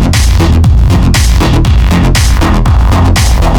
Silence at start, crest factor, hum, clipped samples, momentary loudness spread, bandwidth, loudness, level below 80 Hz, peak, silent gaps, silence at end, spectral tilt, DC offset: 0 s; 6 dB; none; under 0.1%; 1 LU; 18 kHz; -8 LUFS; -8 dBFS; 0 dBFS; none; 0 s; -5.5 dB/octave; under 0.1%